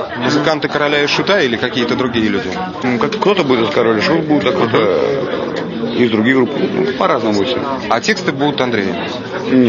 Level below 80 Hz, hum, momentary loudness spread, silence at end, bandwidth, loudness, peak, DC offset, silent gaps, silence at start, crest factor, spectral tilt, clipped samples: -52 dBFS; none; 6 LU; 0 s; 7.4 kHz; -15 LUFS; 0 dBFS; under 0.1%; none; 0 s; 14 dB; -5.5 dB/octave; under 0.1%